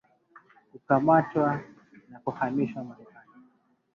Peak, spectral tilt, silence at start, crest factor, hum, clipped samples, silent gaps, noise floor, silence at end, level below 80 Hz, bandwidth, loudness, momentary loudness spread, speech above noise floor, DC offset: -8 dBFS; -10 dB/octave; 0.75 s; 22 dB; none; under 0.1%; none; -65 dBFS; 0.9 s; -68 dBFS; 6.8 kHz; -26 LUFS; 16 LU; 39 dB; under 0.1%